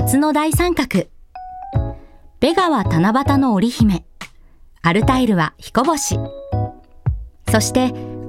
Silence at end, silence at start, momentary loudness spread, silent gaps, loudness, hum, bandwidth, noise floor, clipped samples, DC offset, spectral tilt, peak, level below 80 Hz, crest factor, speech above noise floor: 0 s; 0 s; 13 LU; none; -18 LUFS; none; 17 kHz; -45 dBFS; under 0.1%; under 0.1%; -5.5 dB/octave; -2 dBFS; -34 dBFS; 16 dB; 29 dB